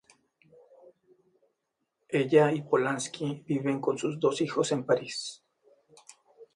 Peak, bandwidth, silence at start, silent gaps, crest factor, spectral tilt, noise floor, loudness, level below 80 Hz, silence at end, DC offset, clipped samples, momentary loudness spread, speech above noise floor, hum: -8 dBFS; 11.5 kHz; 2.1 s; none; 22 dB; -5 dB/octave; -81 dBFS; -28 LUFS; -76 dBFS; 0.1 s; under 0.1%; under 0.1%; 11 LU; 54 dB; none